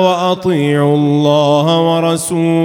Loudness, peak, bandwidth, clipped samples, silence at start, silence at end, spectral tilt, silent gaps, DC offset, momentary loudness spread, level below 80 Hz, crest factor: -12 LUFS; 0 dBFS; 17 kHz; under 0.1%; 0 s; 0 s; -6 dB/octave; none; under 0.1%; 3 LU; -56 dBFS; 12 dB